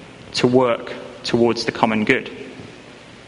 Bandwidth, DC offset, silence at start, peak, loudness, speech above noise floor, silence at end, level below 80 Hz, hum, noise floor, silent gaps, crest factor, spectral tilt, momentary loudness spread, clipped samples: 11 kHz; under 0.1%; 0 s; 0 dBFS; -19 LUFS; 23 dB; 0.05 s; -54 dBFS; none; -41 dBFS; none; 20 dB; -5 dB/octave; 20 LU; under 0.1%